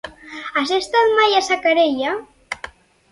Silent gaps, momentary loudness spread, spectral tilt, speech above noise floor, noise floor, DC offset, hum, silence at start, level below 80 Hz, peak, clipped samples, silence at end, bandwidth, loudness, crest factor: none; 17 LU; -2 dB/octave; 22 dB; -39 dBFS; under 0.1%; none; 0.05 s; -56 dBFS; -4 dBFS; under 0.1%; 0.45 s; 11.5 kHz; -17 LUFS; 16 dB